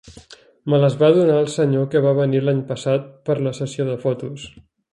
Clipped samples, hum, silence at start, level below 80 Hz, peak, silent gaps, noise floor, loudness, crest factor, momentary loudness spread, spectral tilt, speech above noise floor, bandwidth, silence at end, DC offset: under 0.1%; none; 0.05 s; -58 dBFS; -2 dBFS; none; -46 dBFS; -19 LUFS; 18 dB; 13 LU; -7.5 dB/octave; 27 dB; 11 kHz; 0.3 s; under 0.1%